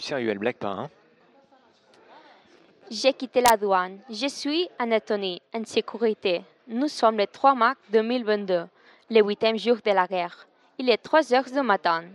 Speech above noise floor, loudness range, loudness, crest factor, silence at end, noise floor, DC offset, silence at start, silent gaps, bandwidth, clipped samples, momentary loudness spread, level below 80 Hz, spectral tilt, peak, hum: 35 dB; 4 LU; -24 LUFS; 22 dB; 0 s; -59 dBFS; under 0.1%; 0 s; none; 12.5 kHz; under 0.1%; 12 LU; -68 dBFS; -4 dB/octave; -4 dBFS; none